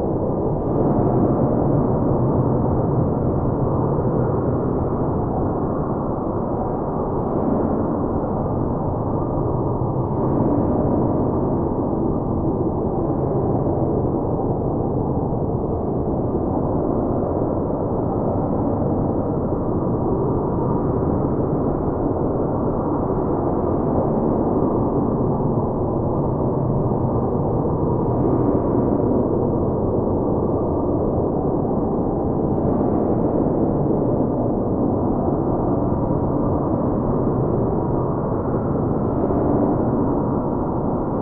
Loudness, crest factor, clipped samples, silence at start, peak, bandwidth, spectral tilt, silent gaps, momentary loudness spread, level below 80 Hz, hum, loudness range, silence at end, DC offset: -21 LUFS; 14 dB; under 0.1%; 0 s; -6 dBFS; 2.4 kHz; -15.5 dB/octave; none; 3 LU; -34 dBFS; none; 2 LU; 0 s; under 0.1%